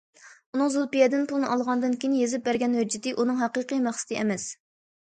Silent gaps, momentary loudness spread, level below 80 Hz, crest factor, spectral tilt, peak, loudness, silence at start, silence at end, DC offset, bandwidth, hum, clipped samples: 0.46-0.53 s; 6 LU; -72 dBFS; 18 dB; -4 dB/octave; -8 dBFS; -26 LUFS; 0.25 s; 0.6 s; under 0.1%; 9.4 kHz; none; under 0.1%